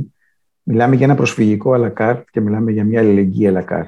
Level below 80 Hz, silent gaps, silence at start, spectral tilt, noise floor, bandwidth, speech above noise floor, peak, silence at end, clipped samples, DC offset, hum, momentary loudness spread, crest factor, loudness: -58 dBFS; none; 0 s; -8 dB/octave; -66 dBFS; 9.6 kHz; 52 dB; -2 dBFS; 0 s; under 0.1%; under 0.1%; none; 7 LU; 12 dB; -15 LUFS